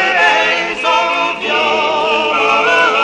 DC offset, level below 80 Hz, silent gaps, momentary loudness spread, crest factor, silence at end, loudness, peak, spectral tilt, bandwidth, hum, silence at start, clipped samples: under 0.1%; -52 dBFS; none; 4 LU; 12 dB; 0 s; -12 LUFS; 0 dBFS; -2 dB/octave; 10.5 kHz; none; 0 s; under 0.1%